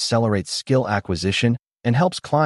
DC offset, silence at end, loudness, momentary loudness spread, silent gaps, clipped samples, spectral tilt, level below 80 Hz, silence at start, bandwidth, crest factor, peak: under 0.1%; 0 s; -21 LUFS; 3 LU; 1.59-1.63 s; under 0.1%; -5.5 dB/octave; -50 dBFS; 0 s; 11.5 kHz; 14 dB; -6 dBFS